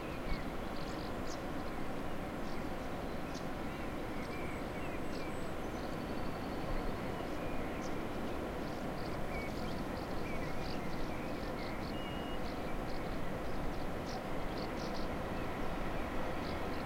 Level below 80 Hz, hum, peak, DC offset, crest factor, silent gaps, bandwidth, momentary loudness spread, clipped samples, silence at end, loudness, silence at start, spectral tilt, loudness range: -46 dBFS; none; -24 dBFS; under 0.1%; 14 dB; none; 16 kHz; 2 LU; under 0.1%; 0 s; -41 LUFS; 0 s; -6 dB/octave; 1 LU